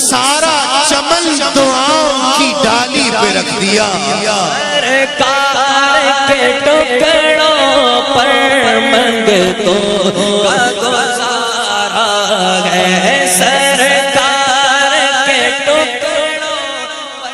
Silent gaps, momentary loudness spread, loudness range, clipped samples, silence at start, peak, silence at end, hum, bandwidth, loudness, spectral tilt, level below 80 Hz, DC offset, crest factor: none; 4 LU; 2 LU; under 0.1%; 0 s; 0 dBFS; 0 s; none; 15.5 kHz; -10 LUFS; -2 dB/octave; -46 dBFS; under 0.1%; 10 dB